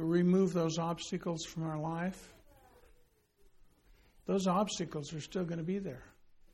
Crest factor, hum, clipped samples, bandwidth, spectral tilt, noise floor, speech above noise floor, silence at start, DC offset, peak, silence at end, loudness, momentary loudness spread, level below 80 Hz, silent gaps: 18 dB; none; under 0.1%; 12.5 kHz; -6 dB/octave; -67 dBFS; 33 dB; 0 s; under 0.1%; -18 dBFS; 0.45 s; -35 LUFS; 12 LU; -64 dBFS; none